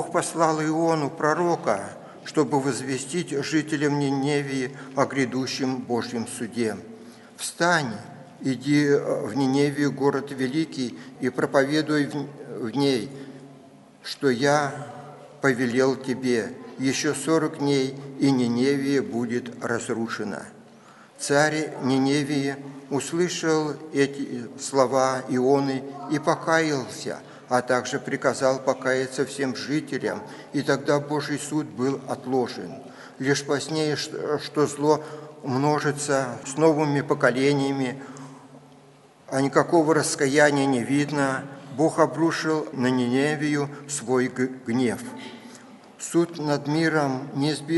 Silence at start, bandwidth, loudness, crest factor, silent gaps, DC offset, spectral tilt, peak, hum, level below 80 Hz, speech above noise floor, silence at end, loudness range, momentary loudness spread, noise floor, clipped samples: 0 s; 11.5 kHz; -24 LUFS; 22 dB; none; under 0.1%; -5 dB/octave; -2 dBFS; none; -70 dBFS; 28 dB; 0 s; 4 LU; 12 LU; -52 dBFS; under 0.1%